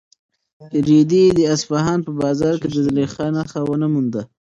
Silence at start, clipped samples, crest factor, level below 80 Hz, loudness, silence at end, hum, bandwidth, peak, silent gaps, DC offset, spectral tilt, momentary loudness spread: 0.6 s; under 0.1%; 14 dB; -50 dBFS; -18 LUFS; 0.25 s; none; 7.8 kHz; -4 dBFS; none; under 0.1%; -6.5 dB/octave; 9 LU